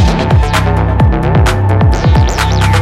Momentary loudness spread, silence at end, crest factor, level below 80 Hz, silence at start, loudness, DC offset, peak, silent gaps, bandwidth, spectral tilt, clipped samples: 2 LU; 0 s; 8 dB; -14 dBFS; 0 s; -10 LUFS; under 0.1%; 0 dBFS; none; 14 kHz; -6 dB/octave; under 0.1%